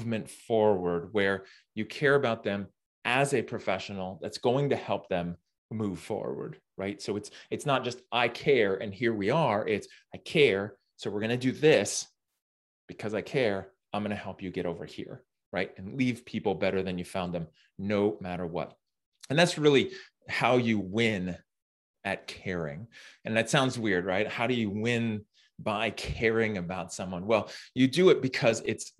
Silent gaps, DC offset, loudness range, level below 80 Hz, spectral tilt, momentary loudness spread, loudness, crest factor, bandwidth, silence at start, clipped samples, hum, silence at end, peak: 2.86-3.02 s, 5.58-5.69 s, 12.42-12.88 s, 15.46-15.52 s, 19.06-19.12 s, 21.62-21.94 s; under 0.1%; 6 LU; -60 dBFS; -5 dB/octave; 14 LU; -29 LUFS; 22 dB; 12.5 kHz; 0 s; under 0.1%; none; 0.1 s; -8 dBFS